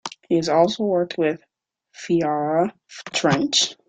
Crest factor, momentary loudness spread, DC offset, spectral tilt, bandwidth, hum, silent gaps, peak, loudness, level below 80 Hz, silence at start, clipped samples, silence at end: 18 dB; 9 LU; under 0.1%; -4 dB/octave; 9.4 kHz; none; none; -4 dBFS; -21 LUFS; -60 dBFS; 0.05 s; under 0.1%; 0.15 s